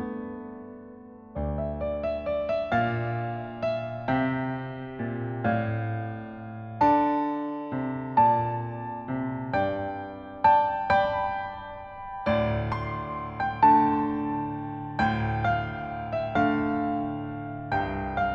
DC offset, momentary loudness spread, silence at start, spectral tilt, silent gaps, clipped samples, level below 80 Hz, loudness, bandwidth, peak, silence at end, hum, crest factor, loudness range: under 0.1%; 15 LU; 0 s; -9 dB/octave; none; under 0.1%; -46 dBFS; -27 LUFS; 6.8 kHz; -8 dBFS; 0 s; none; 18 dB; 4 LU